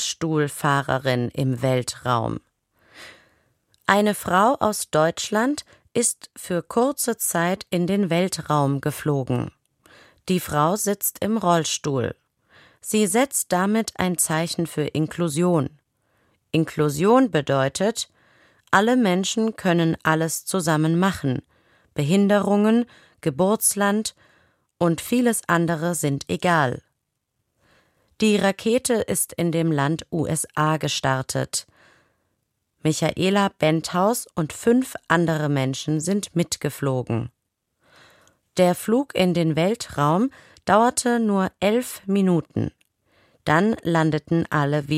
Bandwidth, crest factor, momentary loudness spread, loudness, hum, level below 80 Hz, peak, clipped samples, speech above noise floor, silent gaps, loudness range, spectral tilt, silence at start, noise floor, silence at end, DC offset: 16 kHz; 20 dB; 8 LU; -22 LUFS; none; -56 dBFS; -2 dBFS; under 0.1%; 55 dB; none; 3 LU; -5 dB/octave; 0 s; -77 dBFS; 0 s; under 0.1%